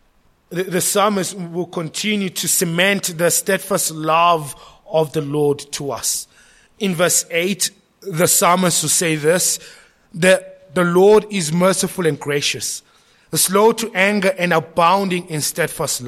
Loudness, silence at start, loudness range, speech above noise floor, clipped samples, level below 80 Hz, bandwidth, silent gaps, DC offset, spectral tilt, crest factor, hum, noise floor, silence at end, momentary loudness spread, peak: -17 LUFS; 0.5 s; 3 LU; 39 dB; under 0.1%; -58 dBFS; 16.5 kHz; none; under 0.1%; -3 dB/octave; 16 dB; none; -57 dBFS; 0 s; 11 LU; -2 dBFS